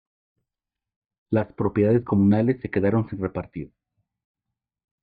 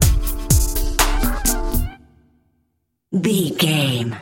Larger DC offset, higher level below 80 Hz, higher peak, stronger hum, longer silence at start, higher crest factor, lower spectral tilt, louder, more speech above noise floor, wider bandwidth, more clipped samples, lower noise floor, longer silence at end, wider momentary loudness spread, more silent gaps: neither; second, -56 dBFS vs -22 dBFS; second, -8 dBFS vs 0 dBFS; neither; first, 1.3 s vs 0 s; about the same, 16 dB vs 18 dB; first, -11.5 dB/octave vs -4 dB/octave; second, -23 LUFS vs -19 LUFS; first, 66 dB vs 52 dB; second, 4.7 kHz vs 17 kHz; neither; first, -88 dBFS vs -70 dBFS; first, 1.35 s vs 0 s; first, 15 LU vs 7 LU; neither